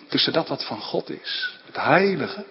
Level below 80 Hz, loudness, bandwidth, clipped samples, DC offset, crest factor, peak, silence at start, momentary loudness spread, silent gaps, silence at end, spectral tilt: -68 dBFS; -23 LUFS; 5.8 kHz; under 0.1%; under 0.1%; 20 dB; -4 dBFS; 0 s; 10 LU; none; 0 s; -9 dB/octave